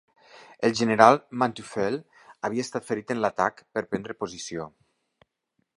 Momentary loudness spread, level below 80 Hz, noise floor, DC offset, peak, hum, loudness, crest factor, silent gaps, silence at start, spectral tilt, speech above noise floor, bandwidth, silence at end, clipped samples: 17 LU; -66 dBFS; -76 dBFS; under 0.1%; 0 dBFS; none; -25 LUFS; 26 dB; none; 0.6 s; -5 dB/octave; 51 dB; 11.5 kHz; 1.1 s; under 0.1%